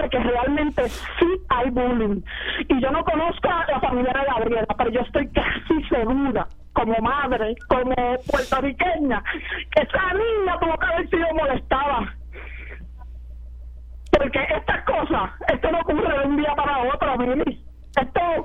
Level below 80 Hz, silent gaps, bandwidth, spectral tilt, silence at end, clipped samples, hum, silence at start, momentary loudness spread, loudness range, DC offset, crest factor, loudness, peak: -36 dBFS; none; 14 kHz; -6.5 dB/octave; 0 s; under 0.1%; none; 0 s; 12 LU; 3 LU; under 0.1%; 18 dB; -22 LUFS; -4 dBFS